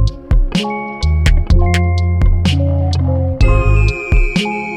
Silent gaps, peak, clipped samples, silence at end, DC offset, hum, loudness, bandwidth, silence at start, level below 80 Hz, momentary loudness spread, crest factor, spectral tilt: none; 0 dBFS; under 0.1%; 0 s; under 0.1%; none; -15 LUFS; 10.5 kHz; 0 s; -14 dBFS; 5 LU; 12 dB; -6.5 dB/octave